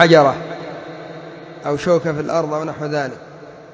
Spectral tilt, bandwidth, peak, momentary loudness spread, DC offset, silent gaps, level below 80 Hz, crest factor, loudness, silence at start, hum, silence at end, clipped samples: -6 dB/octave; 8 kHz; 0 dBFS; 19 LU; under 0.1%; none; -56 dBFS; 18 dB; -19 LUFS; 0 s; none; 0 s; under 0.1%